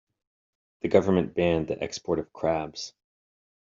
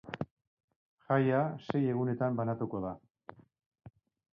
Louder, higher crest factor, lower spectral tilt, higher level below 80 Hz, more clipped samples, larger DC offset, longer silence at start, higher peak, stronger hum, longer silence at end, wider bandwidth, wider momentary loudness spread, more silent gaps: first, -27 LUFS vs -33 LUFS; about the same, 22 dB vs 20 dB; second, -5.5 dB/octave vs -10 dB/octave; first, -58 dBFS vs -68 dBFS; neither; neither; first, 0.85 s vs 0.05 s; first, -6 dBFS vs -16 dBFS; neither; first, 0.75 s vs 0.45 s; first, 7.6 kHz vs 6 kHz; second, 13 LU vs 21 LU; second, none vs 0.31-0.37 s, 0.47-0.57 s, 0.64-0.68 s, 0.76-0.98 s, 3.66-3.71 s